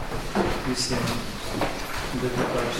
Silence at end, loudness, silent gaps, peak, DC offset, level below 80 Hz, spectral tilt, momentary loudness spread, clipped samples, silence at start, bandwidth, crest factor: 0 s; -27 LUFS; none; -8 dBFS; under 0.1%; -36 dBFS; -4 dB/octave; 5 LU; under 0.1%; 0 s; 16.5 kHz; 18 dB